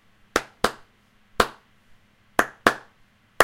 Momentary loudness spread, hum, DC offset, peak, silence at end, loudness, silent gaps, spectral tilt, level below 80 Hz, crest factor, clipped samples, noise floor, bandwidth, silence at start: 7 LU; none; under 0.1%; 0 dBFS; 0 s; -25 LUFS; none; -2.5 dB/octave; -50 dBFS; 26 dB; under 0.1%; -60 dBFS; 16.5 kHz; 0.35 s